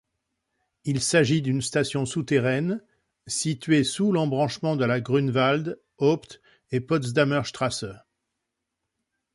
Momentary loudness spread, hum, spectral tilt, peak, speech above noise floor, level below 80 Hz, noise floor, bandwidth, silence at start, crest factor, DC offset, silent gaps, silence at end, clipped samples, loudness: 9 LU; none; -5 dB/octave; -8 dBFS; 58 dB; -60 dBFS; -82 dBFS; 11.5 kHz; 0.85 s; 18 dB; under 0.1%; none; 1.35 s; under 0.1%; -25 LUFS